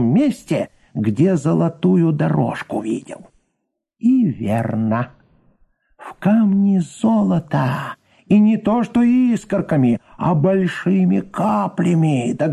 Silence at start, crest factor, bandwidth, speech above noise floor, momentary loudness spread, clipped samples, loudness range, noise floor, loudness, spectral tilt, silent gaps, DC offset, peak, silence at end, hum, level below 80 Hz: 0 s; 12 dB; 11.5 kHz; 58 dB; 8 LU; under 0.1%; 5 LU; -75 dBFS; -18 LUFS; -8.5 dB/octave; none; under 0.1%; -4 dBFS; 0 s; none; -52 dBFS